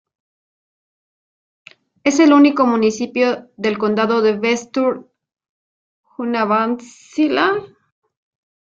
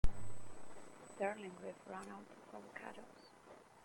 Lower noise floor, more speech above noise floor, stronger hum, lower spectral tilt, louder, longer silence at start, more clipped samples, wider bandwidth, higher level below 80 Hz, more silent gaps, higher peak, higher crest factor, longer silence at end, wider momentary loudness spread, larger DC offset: first, under -90 dBFS vs -62 dBFS; first, over 74 dB vs 13 dB; neither; about the same, -4.5 dB/octave vs -5.5 dB/octave; first, -17 LUFS vs -50 LUFS; first, 2.05 s vs 0.05 s; neither; second, 7.6 kHz vs 16.5 kHz; second, -66 dBFS vs -48 dBFS; first, 5.49-6.04 s vs none; first, -2 dBFS vs -20 dBFS; about the same, 16 dB vs 20 dB; first, 1.1 s vs 0.3 s; second, 11 LU vs 17 LU; neither